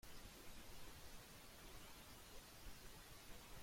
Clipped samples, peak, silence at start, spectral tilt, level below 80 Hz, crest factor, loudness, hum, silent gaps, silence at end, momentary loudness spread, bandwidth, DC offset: under 0.1%; -44 dBFS; 0.05 s; -3 dB/octave; -64 dBFS; 14 dB; -60 LUFS; none; none; 0 s; 1 LU; 16.5 kHz; under 0.1%